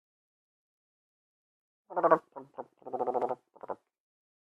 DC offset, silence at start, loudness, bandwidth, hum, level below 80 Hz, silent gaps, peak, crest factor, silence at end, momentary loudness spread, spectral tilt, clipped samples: under 0.1%; 1.9 s; -31 LUFS; 5.6 kHz; none; -88 dBFS; none; -8 dBFS; 28 dB; 0.75 s; 20 LU; -8 dB/octave; under 0.1%